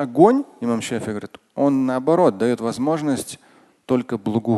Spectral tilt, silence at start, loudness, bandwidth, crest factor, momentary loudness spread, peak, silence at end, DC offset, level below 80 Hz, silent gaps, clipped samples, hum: -6.5 dB/octave; 0 s; -20 LUFS; 12.5 kHz; 20 dB; 14 LU; 0 dBFS; 0 s; under 0.1%; -60 dBFS; none; under 0.1%; none